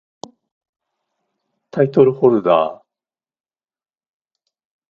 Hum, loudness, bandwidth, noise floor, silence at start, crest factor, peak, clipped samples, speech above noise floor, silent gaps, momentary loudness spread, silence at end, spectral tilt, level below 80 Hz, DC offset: none; -15 LUFS; 7.2 kHz; under -90 dBFS; 1.75 s; 20 dB; 0 dBFS; under 0.1%; over 76 dB; none; 11 LU; 2.15 s; -8.5 dB/octave; -64 dBFS; under 0.1%